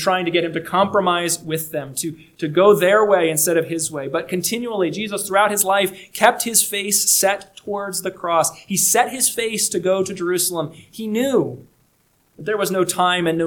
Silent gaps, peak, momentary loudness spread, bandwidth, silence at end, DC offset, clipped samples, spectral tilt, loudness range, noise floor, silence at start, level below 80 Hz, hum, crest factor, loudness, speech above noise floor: none; 0 dBFS; 11 LU; 19 kHz; 0 s; under 0.1%; under 0.1%; -2.5 dB/octave; 4 LU; -61 dBFS; 0 s; -62 dBFS; none; 20 dB; -18 LUFS; 42 dB